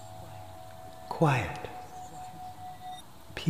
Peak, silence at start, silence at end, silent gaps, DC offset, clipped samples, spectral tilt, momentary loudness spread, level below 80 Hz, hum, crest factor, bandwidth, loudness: -12 dBFS; 0 s; 0 s; none; 0.3%; under 0.1%; -6 dB/octave; 20 LU; -58 dBFS; none; 24 dB; 15.5 kHz; -34 LUFS